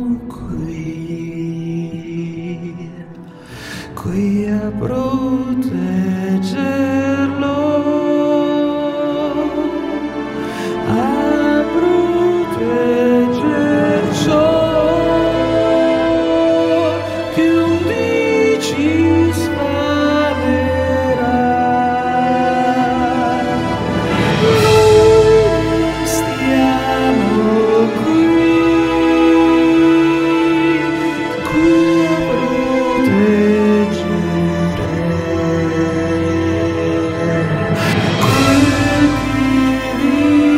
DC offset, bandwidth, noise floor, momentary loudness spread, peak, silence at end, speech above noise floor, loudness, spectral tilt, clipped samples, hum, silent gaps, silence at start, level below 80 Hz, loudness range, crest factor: under 0.1%; 15.5 kHz; -34 dBFS; 10 LU; 0 dBFS; 0 s; 18 dB; -15 LUFS; -6 dB/octave; under 0.1%; none; none; 0 s; -36 dBFS; 6 LU; 14 dB